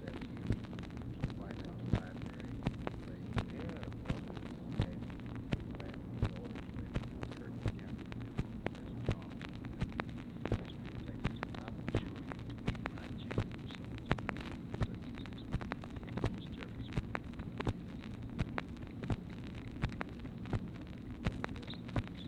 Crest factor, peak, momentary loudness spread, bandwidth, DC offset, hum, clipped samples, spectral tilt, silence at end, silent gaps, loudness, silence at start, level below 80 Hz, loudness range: 28 dB; -14 dBFS; 6 LU; 11 kHz; under 0.1%; none; under 0.1%; -7.5 dB/octave; 0 s; none; -42 LUFS; 0 s; -50 dBFS; 1 LU